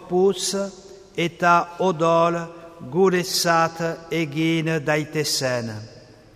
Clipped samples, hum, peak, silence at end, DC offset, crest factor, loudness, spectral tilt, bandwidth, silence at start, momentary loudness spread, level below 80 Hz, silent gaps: under 0.1%; none; -4 dBFS; 0.35 s; under 0.1%; 18 dB; -21 LUFS; -4.5 dB/octave; 15.5 kHz; 0 s; 12 LU; -60 dBFS; none